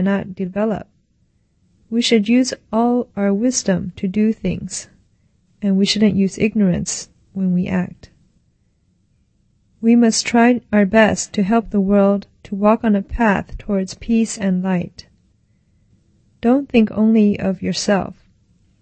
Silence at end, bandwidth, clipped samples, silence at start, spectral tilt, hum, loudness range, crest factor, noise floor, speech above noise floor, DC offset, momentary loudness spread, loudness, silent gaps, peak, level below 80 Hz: 0.7 s; 8.8 kHz; under 0.1%; 0 s; -5.5 dB/octave; none; 6 LU; 18 dB; -61 dBFS; 45 dB; under 0.1%; 9 LU; -17 LUFS; none; 0 dBFS; -42 dBFS